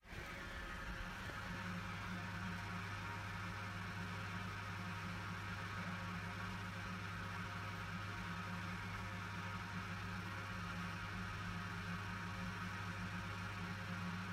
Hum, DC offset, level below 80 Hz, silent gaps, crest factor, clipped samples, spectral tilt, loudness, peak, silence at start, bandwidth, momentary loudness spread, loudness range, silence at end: none; under 0.1%; -60 dBFS; none; 14 dB; under 0.1%; -5 dB/octave; -46 LUFS; -32 dBFS; 0.05 s; 15.5 kHz; 1 LU; 0 LU; 0 s